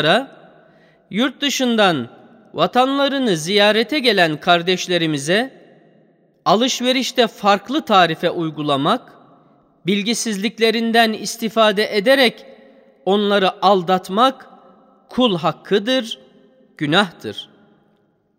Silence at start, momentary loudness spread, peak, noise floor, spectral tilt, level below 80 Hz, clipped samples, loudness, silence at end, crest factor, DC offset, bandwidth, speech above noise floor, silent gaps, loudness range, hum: 0 s; 11 LU; 0 dBFS; -61 dBFS; -4 dB/octave; -66 dBFS; under 0.1%; -17 LUFS; 0.95 s; 18 dB; under 0.1%; 16 kHz; 44 dB; none; 3 LU; none